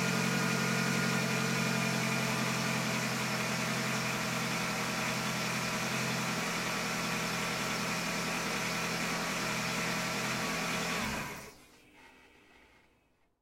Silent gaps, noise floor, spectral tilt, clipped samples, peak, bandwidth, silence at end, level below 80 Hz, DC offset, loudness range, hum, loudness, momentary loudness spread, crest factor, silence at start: none; -71 dBFS; -3.5 dB/octave; under 0.1%; -18 dBFS; 16.5 kHz; 1.3 s; -62 dBFS; under 0.1%; 4 LU; none; -32 LUFS; 3 LU; 14 dB; 0 s